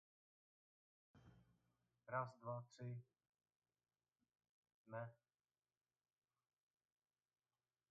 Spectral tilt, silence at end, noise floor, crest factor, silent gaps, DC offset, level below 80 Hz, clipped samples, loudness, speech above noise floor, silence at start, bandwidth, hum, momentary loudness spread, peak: -6.5 dB/octave; 2.75 s; under -90 dBFS; 26 dB; 3.29-3.33 s, 3.56-3.60 s, 4.49-4.63 s, 4.74-4.85 s; under 0.1%; under -90 dBFS; under 0.1%; -52 LUFS; over 39 dB; 1.15 s; 5.6 kHz; none; 10 LU; -32 dBFS